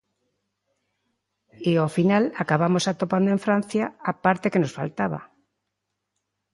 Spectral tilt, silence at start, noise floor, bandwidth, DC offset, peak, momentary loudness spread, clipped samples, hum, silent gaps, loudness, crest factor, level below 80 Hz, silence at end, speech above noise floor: -6.5 dB/octave; 1.6 s; -80 dBFS; 11.5 kHz; under 0.1%; -6 dBFS; 7 LU; under 0.1%; 50 Hz at -45 dBFS; none; -23 LUFS; 18 dB; -66 dBFS; 1.3 s; 58 dB